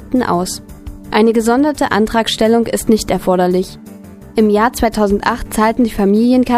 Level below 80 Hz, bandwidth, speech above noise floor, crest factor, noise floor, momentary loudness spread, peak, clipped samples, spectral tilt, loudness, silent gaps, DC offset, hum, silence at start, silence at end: -34 dBFS; 15.5 kHz; 21 dB; 14 dB; -34 dBFS; 10 LU; 0 dBFS; under 0.1%; -5 dB/octave; -14 LUFS; none; under 0.1%; none; 0 s; 0 s